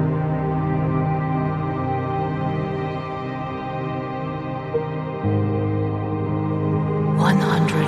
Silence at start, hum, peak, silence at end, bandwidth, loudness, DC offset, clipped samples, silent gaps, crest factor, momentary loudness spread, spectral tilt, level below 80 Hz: 0 s; none; -4 dBFS; 0 s; 12 kHz; -23 LUFS; under 0.1%; under 0.1%; none; 18 dB; 9 LU; -8 dB/octave; -46 dBFS